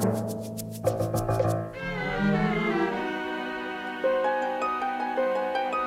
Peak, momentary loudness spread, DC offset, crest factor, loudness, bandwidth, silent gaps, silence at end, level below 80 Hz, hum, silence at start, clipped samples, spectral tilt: -12 dBFS; 7 LU; under 0.1%; 16 dB; -28 LUFS; 16 kHz; none; 0 s; -50 dBFS; none; 0 s; under 0.1%; -6 dB/octave